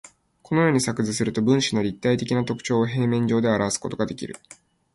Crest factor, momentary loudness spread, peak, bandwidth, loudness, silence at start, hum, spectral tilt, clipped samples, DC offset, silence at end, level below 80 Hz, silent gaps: 16 dB; 8 LU; -8 dBFS; 11.5 kHz; -23 LUFS; 0.5 s; none; -5.5 dB/octave; under 0.1%; under 0.1%; 0.6 s; -56 dBFS; none